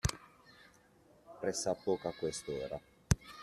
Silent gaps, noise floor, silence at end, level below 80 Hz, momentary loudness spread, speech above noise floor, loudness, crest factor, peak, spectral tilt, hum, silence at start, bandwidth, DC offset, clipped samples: none; -65 dBFS; 0 s; -50 dBFS; 23 LU; 28 dB; -38 LUFS; 26 dB; -12 dBFS; -4.5 dB/octave; none; 0.05 s; 13.5 kHz; under 0.1%; under 0.1%